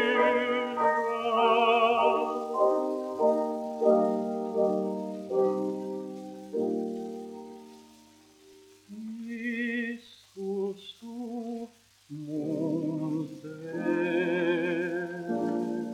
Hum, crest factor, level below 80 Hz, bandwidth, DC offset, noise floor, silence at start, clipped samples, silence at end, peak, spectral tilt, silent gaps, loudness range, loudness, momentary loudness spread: none; 18 dB; -78 dBFS; 14.5 kHz; under 0.1%; -57 dBFS; 0 s; under 0.1%; 0 s; -10 dBFS; -6 dB/octave; none; 12 LU; -29 LUFS; 17 LU